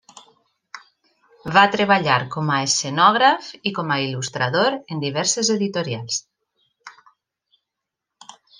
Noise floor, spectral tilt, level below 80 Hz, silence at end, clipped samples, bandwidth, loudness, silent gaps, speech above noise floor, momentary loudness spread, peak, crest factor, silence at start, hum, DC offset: -83 dBFS; -3 dB/octave; -64 dBFS; 1.7 s; under 0.1%; 10.5 kHz; -19 LUFS; none; 63 dB; 11 LU; -2 dBFS; 20 dB; 0.15 s; none; under 0.1%